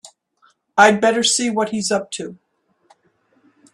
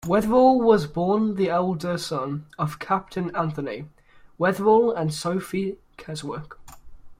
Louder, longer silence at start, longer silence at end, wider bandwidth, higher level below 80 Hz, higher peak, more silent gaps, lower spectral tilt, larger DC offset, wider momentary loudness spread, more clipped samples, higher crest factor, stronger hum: first, -17 LUFS vs -23 LUFS; about the same, 0.05 s vs 0.05 s; first, 1.4 s vs 0.05 s; second, 13 kHz vs 16 kHz; second, -62 dBFS vs -52 dBFS; first, 0 dBFS vs -4 dBFS; neither; second, -2.5 dB/octave vs -6.5 dB/octave; neither; about the same, 17 LU vs 16 LU; neither; about the same, 20 dB vs 18 dB; neither